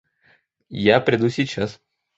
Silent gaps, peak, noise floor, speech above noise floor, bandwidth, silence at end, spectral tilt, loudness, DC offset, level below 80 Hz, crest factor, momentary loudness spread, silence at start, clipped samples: none; -2 dBFS; -61 dBFS; 41 dB; 8 kHz; 0.45 s; -6 dB/octave; -20 LUFS; under 0.1%; -54 dBFS; 20 dB; 12 LU; 0.7 s; under 0.1%